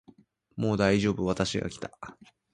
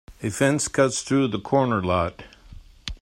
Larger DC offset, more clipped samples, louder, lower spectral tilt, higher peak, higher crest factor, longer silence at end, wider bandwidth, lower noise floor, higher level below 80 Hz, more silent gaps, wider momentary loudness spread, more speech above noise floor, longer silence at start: neither; neither; second, -28 LUFS vs -23 LUFS; about the same, -5.5 dB/octave vs -5 dB/octave; about the same, -8 dBFS vs -6 dBFS; about the same, 22 dB vs 18 dB; first, 0.4 s vs 0.05 s; second, 10.5 kHz vs 16 kHz; first, -59 dBFS vs -45 dBFS; second, -52 dBFS vs -46 dBFS; neither; first, 21 LU vs 10 LU; first, 31 dB vs 23 dB; first, 0.55 s vs 0.1 s